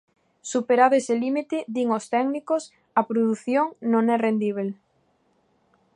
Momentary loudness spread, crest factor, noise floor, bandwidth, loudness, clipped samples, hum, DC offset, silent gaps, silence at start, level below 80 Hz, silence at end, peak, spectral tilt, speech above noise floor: 10 LU; 20 dB; -66 dBFS; 11 kHz; -23 LUFS; under 0.1%; none; under 0.1%; none; 0.45 s; -78 dBFS; 1.25 s; -6 dBFS; -5.5 dB/octave; 44 dB